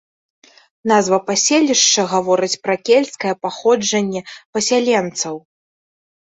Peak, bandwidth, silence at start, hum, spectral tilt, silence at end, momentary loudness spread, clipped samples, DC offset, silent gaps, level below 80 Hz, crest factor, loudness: -2 dBFS; 8.4 kHz; 0.85 s; none; -2.5 dB/octave; 0.8 s; 11 LU; under 0.1%; under 0.1%; 4.45-4.53 s; -64 dBFS; 16 dB; -16 LUFS